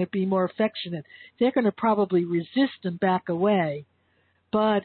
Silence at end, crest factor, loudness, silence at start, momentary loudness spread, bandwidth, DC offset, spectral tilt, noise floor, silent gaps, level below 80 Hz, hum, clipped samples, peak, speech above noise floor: 0 s; 14 dB; -25 LUFS; 0 s; 8 LU; 4.5 kHz; under 0.1%; -11 dB/octave; -67 dBFS; none; -68 dBFS; none; under 0.1%; -12 dBFS; 43 dB